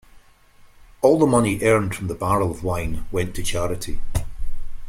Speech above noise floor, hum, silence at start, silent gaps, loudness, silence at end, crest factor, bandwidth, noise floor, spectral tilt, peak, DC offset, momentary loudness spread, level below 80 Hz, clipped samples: 30 dB; none; 0.15 s; none; -22 LUFS; 0 s; 18 dB; 15.5 kHz; -50 dBFS; -5.5 dB/octave; -2 dBFS; under 0.1%; 13 LU; -32 dBFS; under 0.1%